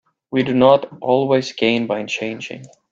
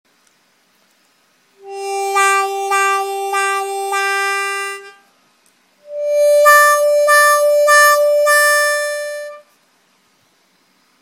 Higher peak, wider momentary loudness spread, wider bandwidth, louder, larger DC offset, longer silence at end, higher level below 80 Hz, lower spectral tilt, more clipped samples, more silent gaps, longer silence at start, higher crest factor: about the same, 0 dBFS vs 0 dBFS; about the same, 15 LU vs 17 LU; second, 7.6 kHz vs 17 kHz; second, -18 LUFS vs -13 LUFS; neither; second, 0.25 s vs 1.6 s; first, -60 dBFS vs -86 dBFS; first, -5.5 dB/octave vs 2 dB/octave; neither; neither; second, 0.3 s vs 1.65 s; about the same, 18 dB vs 16 dB